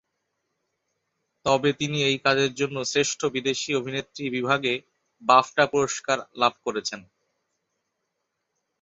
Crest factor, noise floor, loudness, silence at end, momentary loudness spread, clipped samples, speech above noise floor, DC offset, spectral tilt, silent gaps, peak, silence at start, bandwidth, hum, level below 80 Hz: 24 dB; -79 dBFS; -24 LUFS; 1.8 s; 11 LU; under 0.1%; 55 dB; under 0.1%; -3.5 dB/octave; none; -4 dBFS; 1.45 s; 8 kHz; none; -66 dBFS